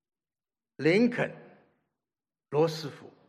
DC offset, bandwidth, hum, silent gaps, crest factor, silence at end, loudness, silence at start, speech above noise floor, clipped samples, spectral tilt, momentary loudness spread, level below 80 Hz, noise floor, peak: under 0.1%; 13.5 kHz; none; none; 18 dB; 0.2 s; -28 LUFS; 0.8 s; over 62 dB; under 0.1%; -6.5 dB/octave; 13 LU; -80 dBFS; under -90 dBFS; -12 dBFS